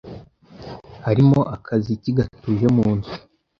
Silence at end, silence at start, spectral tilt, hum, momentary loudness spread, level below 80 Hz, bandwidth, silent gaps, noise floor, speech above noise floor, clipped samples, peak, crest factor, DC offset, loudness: 0.4 s; 0.05 s; -9.5 dB/octave; none; 22 LU; -46 dBFS; 7 kHz; none; -42 dBFS; 24 dB; under 0.1%; -4 dBFS; 16 dB; under 0.1%; -20 LUFS